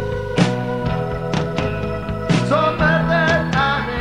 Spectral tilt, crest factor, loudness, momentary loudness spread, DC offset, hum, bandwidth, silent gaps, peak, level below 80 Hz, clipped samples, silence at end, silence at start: -6.5 dB/octave; 16 dB; -19 LUFS; 7 LU; 0.7%; none; 11 kHz; none; -2 dBFS; -34 dBFS; under 0.1%; 0 s; 0 s